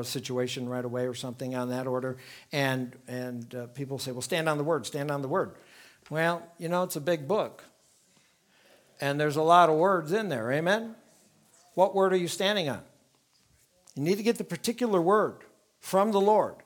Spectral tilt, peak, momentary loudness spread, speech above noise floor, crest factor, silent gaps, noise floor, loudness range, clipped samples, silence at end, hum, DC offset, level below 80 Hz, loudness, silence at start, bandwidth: -5 dB/octave; -6 dBFS; 14 LU; 39 dB; 22 dB; none; -67 dBFS; 6 LU; under 0.1%; 0.1 s; none; under 0.1%; -78 dBFS; -28 LUFS; 0 s; 19.5 kHz